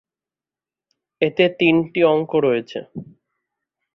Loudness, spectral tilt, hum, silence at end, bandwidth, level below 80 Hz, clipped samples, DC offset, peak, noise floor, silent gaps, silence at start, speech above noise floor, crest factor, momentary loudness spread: -18 LUFS; -8 dB/octave; none; 0.9 s; 6.2 kHz; -64 dBFS; under 0.1%; under 0.1%; -2 dBFS; under -90 dBFS; none; 1.2 s; over 72 dB; 20 dB; 15 LU